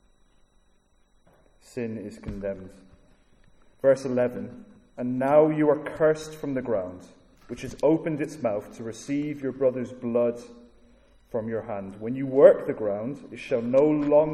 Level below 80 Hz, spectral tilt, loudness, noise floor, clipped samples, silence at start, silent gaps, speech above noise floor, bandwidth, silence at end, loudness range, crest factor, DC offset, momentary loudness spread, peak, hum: -56 dBFS; -7.5 dB/octave; -25 LUFS; -63 dBFS; under 0.1%; 1.75 s; none; 38 dB; 12 kHz; 0 s; 6 LU; 24 dB; under 0.1%; 18 LU; -4 dBFS; none